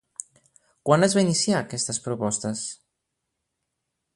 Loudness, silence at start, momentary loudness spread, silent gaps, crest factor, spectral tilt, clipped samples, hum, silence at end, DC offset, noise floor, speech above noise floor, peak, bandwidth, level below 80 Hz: -23 LUFS; 0.2 s; 18 LU; none; 24 dB; -4 dB/octave; under 0.1%; none; 1.4 s; under 0.1%; -81 dBFS; 57 dB; -4 dBFS; 11.5 kHz; -64 dBFS